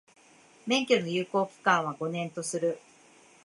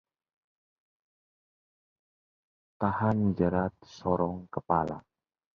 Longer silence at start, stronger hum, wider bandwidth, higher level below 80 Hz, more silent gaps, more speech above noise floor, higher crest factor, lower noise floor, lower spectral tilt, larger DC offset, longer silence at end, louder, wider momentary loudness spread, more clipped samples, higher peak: second, 0.65 s vs 2.8 s; neither; first, 11.5 kHz vs 6.8 kHz; second, -82 dBFS vs -54 dBFS; neither; second, 30 dB vs over 61 dB; about the same, 24 dB vs 22 dB; second, -58 dBFS vs under -90 dBFS; second, -4 dB/octave vs -9 dB/octave; neither; about the same, 0.65 s vs 0.6 s; about the same, -29 LUFS vs -30 LUFS; about the same, 8 LU vs 10 LU; neither; about the same, -8 dBFS vs -10 dBFS